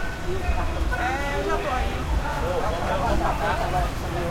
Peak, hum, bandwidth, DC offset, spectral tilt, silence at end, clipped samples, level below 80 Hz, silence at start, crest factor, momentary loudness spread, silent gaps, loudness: -10 dBFS; none; 16.5 kHz; under 0.1%; -5.5 dB/octave; 0 s; under 0.1%; -28 dBFS; 0 s; 14 dB; 4 LU; none; -26 LUFS